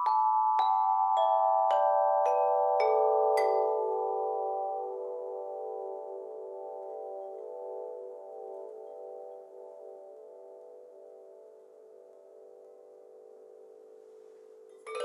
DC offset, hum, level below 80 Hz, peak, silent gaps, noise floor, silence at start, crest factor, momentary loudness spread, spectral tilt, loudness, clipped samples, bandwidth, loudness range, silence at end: under 0.1%; none; under -90 dBFS; -16 dBFS; none; -54 dBFS; 0 s; 16 dB; 24 LU; -1.5 dB/octave; -29 LUFS; under 0.1%; 12 kHz; 25 LU; 0 s